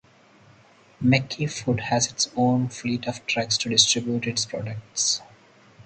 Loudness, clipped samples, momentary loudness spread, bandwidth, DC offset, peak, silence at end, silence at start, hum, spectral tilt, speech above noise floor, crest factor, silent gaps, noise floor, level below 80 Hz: -23 LUFS; under 0.1%; 10 LU; 9.4 kHz; under 0.1%; -2 dBFS; 0.05 s; 1 s; none; -3 dB/octave; 30 dB; 24 dB; none; -54 dBFS; -58 dBFS